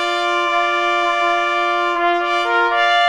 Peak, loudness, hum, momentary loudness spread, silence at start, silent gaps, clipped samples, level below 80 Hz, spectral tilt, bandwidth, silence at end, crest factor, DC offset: -2 dBFS; -16 LUFS; none; 2 LU; 0 s; none; under 0.1%; -58 dBFS; -0.5 dB/octave; 11 kHz; 0 s; 14 dB; 0.2%